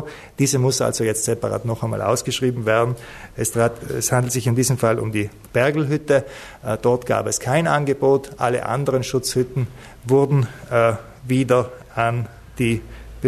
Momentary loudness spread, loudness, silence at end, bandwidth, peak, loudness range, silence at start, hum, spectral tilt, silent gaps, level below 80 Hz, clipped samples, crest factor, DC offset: 9 LU; -20 LUFS; 0 s; 14 kHz; -4 dBFS; 1 LU; 0 s; none; -5 dB/octave; none; -46 dBFS; under 0.1%; 16 dB; under 0.1%